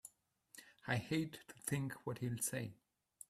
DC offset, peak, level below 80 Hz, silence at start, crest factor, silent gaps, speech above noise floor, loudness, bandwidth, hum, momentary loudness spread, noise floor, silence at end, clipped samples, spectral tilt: under 0.1%; -22 dBFS; -74 dBFS; 0.05 s; 22 dB; none; 27 dB; -42 LUFS; 15.5 kHz; none; 20 LU; -69 dBFS; 0.55 s; under 0.1%; -4.5 dB/octave